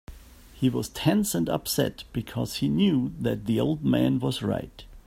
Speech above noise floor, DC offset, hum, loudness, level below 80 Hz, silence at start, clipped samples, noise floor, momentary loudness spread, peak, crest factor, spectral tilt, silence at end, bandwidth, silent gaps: 22 dB; under 0.1%; none; -26 LUFS; -48 dBFS; 0.1 s; under 0.1%; -48 dBFS; 8 LU; -10 dBFS; 16 dB; -5.5 dB/octave; 0.05 s; 16 kHz; none